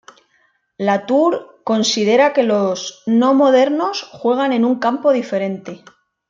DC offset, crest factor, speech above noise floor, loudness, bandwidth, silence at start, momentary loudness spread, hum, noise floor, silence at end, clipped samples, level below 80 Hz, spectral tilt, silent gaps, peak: under 0.1%; 14 dB; 45 dB; -16 LUFS; 7.6 kHz; 0.8 s; 10 LU; none; -61 dBFS; 0.5 s; under 0.1%; -68 dBFS; -4.5 dB/octave; none; -2 dBFS